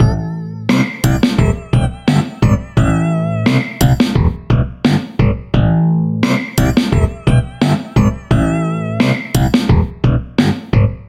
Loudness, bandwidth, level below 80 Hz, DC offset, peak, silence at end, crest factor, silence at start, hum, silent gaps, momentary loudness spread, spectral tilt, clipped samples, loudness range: -15 LUFS; 16.5 kHz; -24 dBFS; under 0.1%; 0 dBFS; 0 s; 14 dB; 0 s; none; none; 3 LU; -7 dB/octave; under 0.1%; 1 LU